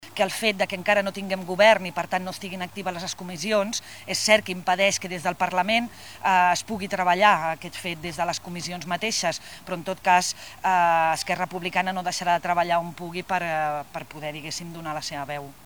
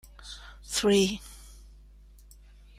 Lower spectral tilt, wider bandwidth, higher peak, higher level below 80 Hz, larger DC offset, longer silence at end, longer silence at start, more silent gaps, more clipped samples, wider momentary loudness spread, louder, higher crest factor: about the same, -3 dB/octave vs -4 dB/octave; first, over 20 kHz vs 16 kHz; first, -4 dBFS vs -12 dBFS; second, -60 dBFS vs -50 dBFS; first, 0.3% vs under 0.1%; second, 0.15 s vs 1.25 s; second, 0 s vs 0.2 s; neither; neither; second, 13 LU vs 24 LU; about the same, -24 LUFS vs -26 LUFS; about the same, 20 dB vs 20 dB